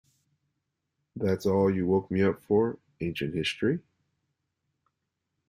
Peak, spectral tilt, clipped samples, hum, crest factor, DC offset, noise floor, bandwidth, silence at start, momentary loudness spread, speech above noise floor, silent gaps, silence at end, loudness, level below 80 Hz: -12 dBFS; -7 dB/octave; under 0.1%; none; 18 dB; under 0.1%; -82 dBFS; 15.5 kHz; 1.15 s; 10 LU; 56 dB; none; 1.7 s; -28 LUFS; -62 dBFS